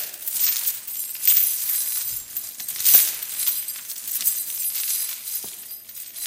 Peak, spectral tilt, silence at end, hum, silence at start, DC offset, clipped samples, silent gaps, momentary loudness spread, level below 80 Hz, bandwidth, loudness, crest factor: 0 dBFS; 3 dB/octave; 0 s; none; 0 s; under 0.1%; under 0.1%; none; 15 LU; -70 dBFS; 17 kHz; -20 LUFS; 24 dB